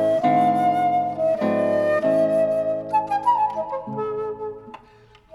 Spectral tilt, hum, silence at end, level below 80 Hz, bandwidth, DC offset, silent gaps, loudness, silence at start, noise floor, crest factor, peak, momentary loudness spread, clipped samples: -7.5 dB/octave; none; 0.6 s; -60 dBFS; 12 kHz; under 0.1%; none; -21 LUFS; 0 s; -51 dBFS; 12 dB; -8 dBFS; 10 LU; under 0.1%